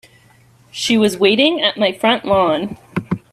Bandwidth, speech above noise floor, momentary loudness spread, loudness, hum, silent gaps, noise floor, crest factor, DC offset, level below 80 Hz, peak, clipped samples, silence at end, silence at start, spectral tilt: 14.5 kHz; 35 dB; 11 LU; -16 LUFS; none; none; -50 dBFS; 16 dB; under 0.1%; -52 dBFS; 0 dBFS; under 0.1%; 0.15 s; 0.75 s; -4.5 dB/octave